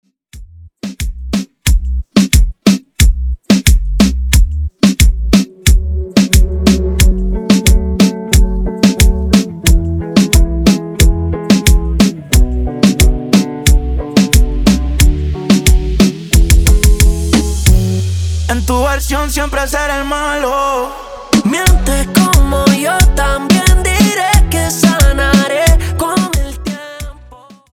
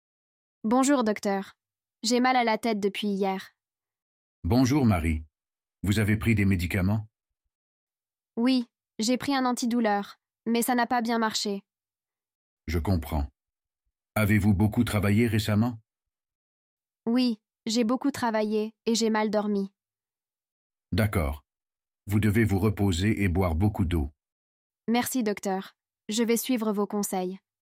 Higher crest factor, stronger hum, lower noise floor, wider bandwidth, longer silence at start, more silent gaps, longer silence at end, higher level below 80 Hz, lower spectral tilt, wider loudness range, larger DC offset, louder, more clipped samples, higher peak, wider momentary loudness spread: second, 10 dB vs 16 dB; neither; second, -38 dBFS vs under -90 dBFS; first, over 20 kHz vs 16 kHz; second, 0.35 s vs 0.65 s; second, none vs 4.02-4.42 s, 7.55-7.87 s, 12.35-12.57 s, 16.35-16.77 s, 20.52-20.70 s, 24.32-24.70 s; first, 0.4 s vs 0.25 s; first, -14 dBFS vs -46 dBFS; about the same, -5 dB/octave vs -5.5 dB/octave; about the same, 3 LU vs 3 LU; neither; first, -12 LUFS vs -27 LUFS; neither; first, 0 dBFS vs -10 dBFS; second, 7 LU vs 11 LU